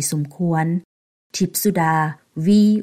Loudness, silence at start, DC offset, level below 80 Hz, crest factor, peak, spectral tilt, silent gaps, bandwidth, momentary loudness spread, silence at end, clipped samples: -20 LUFS; 0 s; under 0.1%; -60 dBFS; 12 dB; -6 dBFS; -5.5 dB/octave; 0.85-1.30 s; 16 kHz; 10 LU; 0 s; under 0.1%